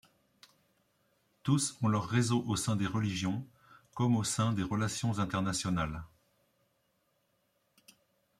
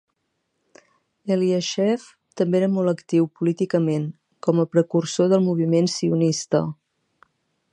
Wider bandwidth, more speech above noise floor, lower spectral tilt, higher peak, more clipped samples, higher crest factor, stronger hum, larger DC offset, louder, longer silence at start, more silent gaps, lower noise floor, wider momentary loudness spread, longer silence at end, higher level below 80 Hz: first, 15 kHz vs 10.5 kHz; second, 45 dB vs 54 dB; second, -5 dB/octave vs -6.5 dB/octave; second, -16 dBFS vs -6 dBFS; neither; about the same, 18 dB vs 18 dB; neither; neither; second, -32 LUFS vs -22 LUFS; first, 1.45 s vs 1.25 s; neither; about the same, -76 dBFS vs -74 dBFS; about the same, 9 LU vs 7 LU; first, 2.35 s vs 1 s; first, -60 dBFS vs -70 dBFS